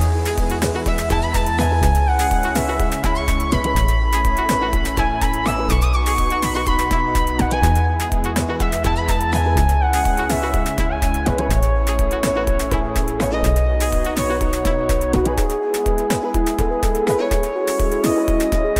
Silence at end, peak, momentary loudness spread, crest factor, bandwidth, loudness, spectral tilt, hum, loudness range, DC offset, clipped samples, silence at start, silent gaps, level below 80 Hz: 0 s; -2 dBFS; 4 LU; 14 dB; 16.5 kHz; -19 LUFS; -5.5 dB/octave; none; 1 LU; under 0.1%; under 0.1%; 0 s; none; -20 dBFS